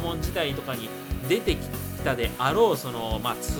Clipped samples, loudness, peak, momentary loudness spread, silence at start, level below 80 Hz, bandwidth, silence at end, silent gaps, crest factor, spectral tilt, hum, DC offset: under 0.1%; -27 LUFS; -10 dBFS; 11 LU; 0 s; -38 dBFS; over 20 kHz; 0 s; none; 18 dB; -5 dB/octave; none; under 0.1%